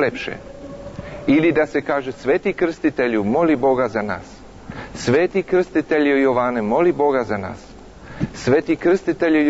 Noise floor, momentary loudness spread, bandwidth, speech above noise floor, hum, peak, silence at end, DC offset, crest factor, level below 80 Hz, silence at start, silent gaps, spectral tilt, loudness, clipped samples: -38 dBFS; 17 LU; 8 kHz; 20 dB; none; -6 dBFS; 0 s; under 0.1%; 12 dB; -46 dBFS; 0 s; none; -6.5 dB/octave; -19 LUFS; under 0.1%